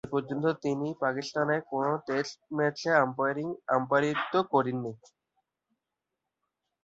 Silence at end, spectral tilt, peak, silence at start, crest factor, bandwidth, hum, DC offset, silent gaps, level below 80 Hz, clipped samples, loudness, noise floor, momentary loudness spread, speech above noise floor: 1.9 s; -6 dB/octave; -10 dBFS; 0.05 s; 20 dB; 8 kHz; none; under 0.1%; none; -72 dBFS; under 0.1%; -29 LUFS; -87 dBFS; 7 LU; 58 dB